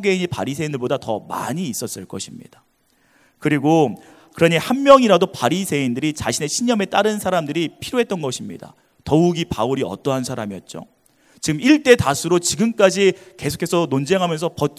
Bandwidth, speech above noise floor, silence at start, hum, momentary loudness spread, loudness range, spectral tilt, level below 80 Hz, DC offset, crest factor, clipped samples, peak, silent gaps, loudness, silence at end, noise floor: 16 kHz; 41 dB; 0 s; none; 14 LU; 6 LU; -4.5 dB/octave; -50 dBFS; under 0.1%; 20 dB; under 0.1%; 0 dBFS; none; -19 LUFS; 0.1 s; -60 dBFS